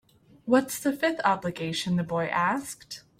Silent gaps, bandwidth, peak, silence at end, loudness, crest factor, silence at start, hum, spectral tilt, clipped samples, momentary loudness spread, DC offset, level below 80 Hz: none; 16.5 kHz; -8 dBFS; 0.2 s; -27 LUFS; 20 dB; 0.45 s; none; -5 dB/octave; under 0.1%; 10 LU; under 0.1%; -64 dBFS